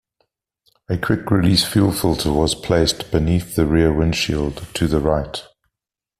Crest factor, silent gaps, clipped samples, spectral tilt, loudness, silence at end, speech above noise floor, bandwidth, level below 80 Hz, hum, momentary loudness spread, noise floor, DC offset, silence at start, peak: 16 dB; none; under 0.1%; -5.5 dB/octave; -18 LUFS; 0.8 s; 68 dB; 15.5 kHz; -34 dBFS; none; 8 LU; -86 dBFS; under 0.1%; 0.9 s; -2 dBFS